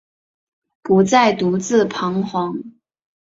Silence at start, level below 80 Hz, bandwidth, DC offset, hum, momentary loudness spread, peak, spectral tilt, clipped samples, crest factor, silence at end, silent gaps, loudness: 0.85 s; -58 dBFS; 7.8 kHz; under 0.1%; none; 12 LU; -2 dBFS; -5.5 dB/octave; under 0.1%; 18 dB; 0.55 s; none; -17 LUFS